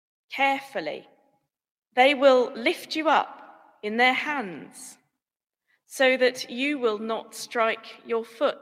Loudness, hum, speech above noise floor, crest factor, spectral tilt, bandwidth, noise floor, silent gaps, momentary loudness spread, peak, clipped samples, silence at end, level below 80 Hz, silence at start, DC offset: -24 LUFS; none; over 66 dB; 20 dB; -2.5 dB/octave; 16 kHz; under -90 dBFS; 1.71-1.82 s; 17 LU; -6 dBFS; under 0.1%; 0.05 s; -82 dBFS; 0.3 s; under 0.1%